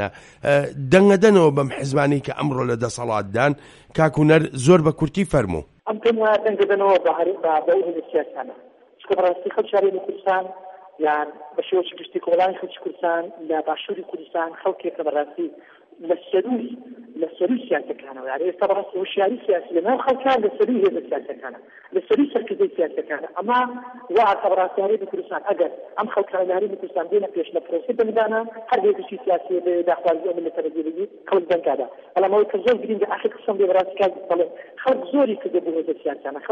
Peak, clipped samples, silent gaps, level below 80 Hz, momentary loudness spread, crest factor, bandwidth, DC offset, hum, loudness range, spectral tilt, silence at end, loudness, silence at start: 0 dBFS; under 0.1%; none; -54 dBFS; 11 LU; 20 dB; 11.5 kHz; under 0.1%; none; 6 LU; -6.5 dB/octave; 0 s; -21 LUFS; 0 s